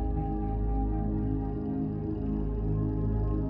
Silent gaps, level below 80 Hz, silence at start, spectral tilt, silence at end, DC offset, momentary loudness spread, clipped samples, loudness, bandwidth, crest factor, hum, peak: none; -34 dBFS; 0 s; -13 dB/octave; 0 s; under 0.1%; 2 LU; under 0.1%; -32 LUFS; 2.9 kHz; 10 dB; none; -18 dBFS